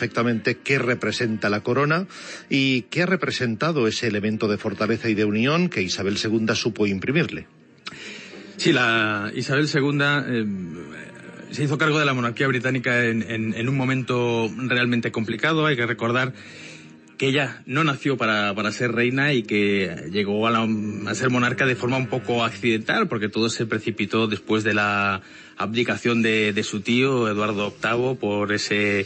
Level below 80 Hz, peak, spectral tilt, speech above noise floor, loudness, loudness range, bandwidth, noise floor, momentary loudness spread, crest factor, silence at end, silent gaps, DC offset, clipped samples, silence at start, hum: -64 dBFS; -6 dBFS; -5 dB/octave; 22 dB; -22 LUFS; 1 LU; 8.8 kHz; -44 dBFS; 8 LU; 16 dB; 0 s; none; under 0.1%; under 0.1%; 0 s; none